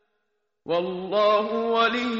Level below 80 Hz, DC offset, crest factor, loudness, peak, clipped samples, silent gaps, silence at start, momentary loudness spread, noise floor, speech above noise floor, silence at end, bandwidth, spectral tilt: -66 dBFS; under 0.1%; 16 dB; -23 LUFS; -10 dBFS; under 0.1%; none; 0.65 s; 6 LU; -77 dBFS; 54 dB; 0 s; 7.6 kHz; -2 dB/octave